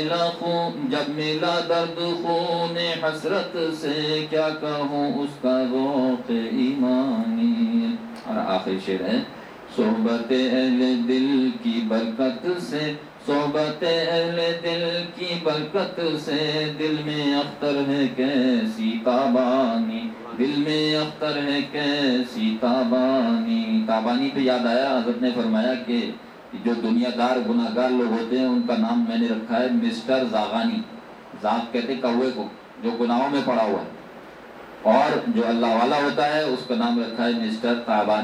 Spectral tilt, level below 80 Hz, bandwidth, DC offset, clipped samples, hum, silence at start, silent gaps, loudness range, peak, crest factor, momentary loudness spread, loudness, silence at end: -6 dB/octave; -66 dBFS; 11 kHz; under 0.1%; under 0.1%; none; 0 s; none; 2 LU; -4 dBFS; 18 dB; 6 LU; -23 LUFS; 0 s